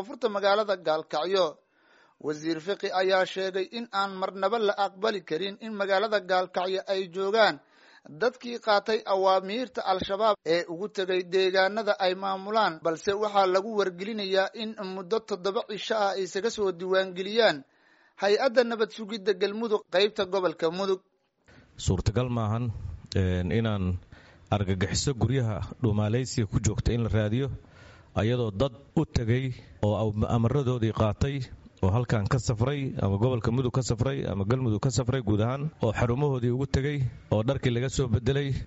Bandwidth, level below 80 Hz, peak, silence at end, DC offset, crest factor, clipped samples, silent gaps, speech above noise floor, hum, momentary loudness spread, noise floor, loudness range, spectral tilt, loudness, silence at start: 8 kHz; -46 dBFS; -8 dBFS; 0 s; under 0.1%; 20 dB; under 0.1%; none; 35 dB; none; 7 LU; -62 dBFS; 3 LU; -5 dB/octave; -28 LUFS; 0 s